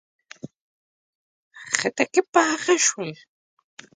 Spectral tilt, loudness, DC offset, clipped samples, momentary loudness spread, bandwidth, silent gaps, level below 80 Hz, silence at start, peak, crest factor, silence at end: -2 dB/octave; -21 LUFS; under 0.1%; under 0.1%; 23 LU; 9.6 kHz; 0.61-1.51 s, 2.28-2.32 s; -74 dBFS; 0.45 s; 0 dBFS; 26 dB; 0.8 s